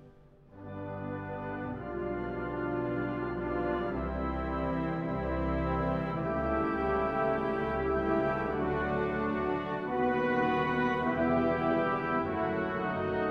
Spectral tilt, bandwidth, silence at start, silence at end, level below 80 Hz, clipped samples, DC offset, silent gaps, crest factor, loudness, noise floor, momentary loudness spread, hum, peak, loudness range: -9 dB/octave; 6.6 kHz; 0 s; 0 s; -46 dBFS; under 0.1%; under 0.1%; none; 16 dB; -32 LUFS; -56 dBFS; 9 LU; none; -16 dBFS; 5 LU